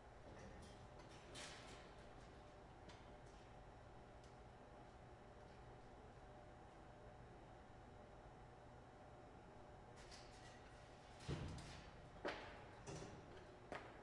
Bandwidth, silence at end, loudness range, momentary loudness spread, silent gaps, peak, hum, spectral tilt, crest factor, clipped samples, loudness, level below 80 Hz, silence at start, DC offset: 11 kHz; 0 s; 7 LU; 10 LU; none; -32 dBFS; none; -5 dB/octave; 26 dB; under 0.1%; -59 LUFS; -68 dBFS; 0 s; under 0.1%